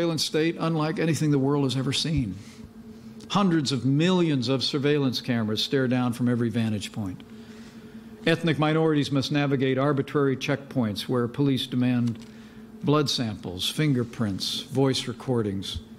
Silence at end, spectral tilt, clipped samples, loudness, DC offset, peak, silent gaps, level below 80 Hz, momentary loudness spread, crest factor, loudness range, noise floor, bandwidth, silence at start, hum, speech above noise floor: 0 s; -5.5 dB/octave; under 0.1%; -25 LUFS; under 0.1%; -6 dBFS; none; -54 dBFS; 20 LU; 18 dB; 2 LU; -44 dBFS; 15.5 kHz; 0 s; none; 20 dB